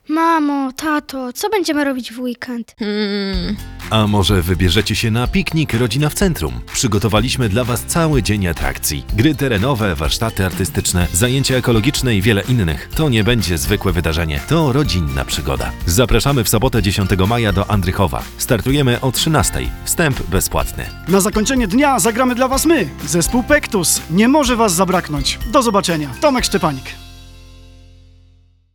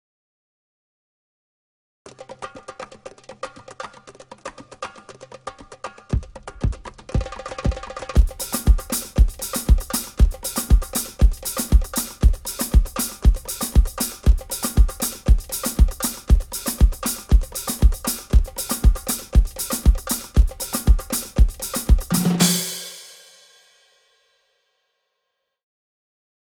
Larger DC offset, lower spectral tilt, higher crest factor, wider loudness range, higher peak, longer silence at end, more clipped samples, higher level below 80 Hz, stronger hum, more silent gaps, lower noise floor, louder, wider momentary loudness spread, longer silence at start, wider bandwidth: neither; about the same, -4.5 dB/octave vs -4.5 dB/octave; about the same, 16 dB vs 18 dB; second, 3 LU vs 16 LU; about the same, 0 dBFS vs -2 dBFS; second, 1.05 s vs 3.45 s; neither; second, -28 dBFS vs -22 dBFS; neither; neither; second, -50 dBFS vs -77 dBFS; first, -16 LUFS vs -22 LUFS; second, 7 LU vs 17 LU; second, 0.1 s vs 2.05 s; about the same, over 20 kHz vs over 20 kHz